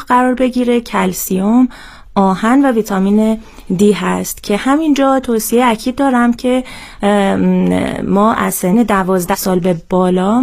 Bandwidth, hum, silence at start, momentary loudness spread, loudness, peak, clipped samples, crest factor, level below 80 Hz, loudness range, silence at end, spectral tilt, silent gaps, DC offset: 16 kHz; none; 0 s; 5 LU; -13 LUFS; 0 dBFS; under 0.1%; 12 dB; -40 dBFS; 1 LU; 0 s; -5.5 dB/octave; none; under 0.1%